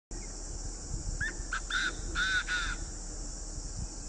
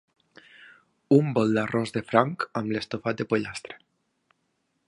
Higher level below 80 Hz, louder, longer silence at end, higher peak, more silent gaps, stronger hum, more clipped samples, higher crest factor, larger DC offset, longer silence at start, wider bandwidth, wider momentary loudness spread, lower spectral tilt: first, -40 dBFS vs -64 dBFS; second, -35 LUFS vs -25 LUFS; second, 0 s vs 1.1 s; second, -18 dBFS vs -2 dBFS; neither; neither; neither; second, 16 dB vs 26 dB; neither; second, 0.1 s vs 1.1 s; second, 10 kHz vs 11.5 kHz; second, 11 LU vs 14 LU; second, -2 dB/octave vs -7 dB/octave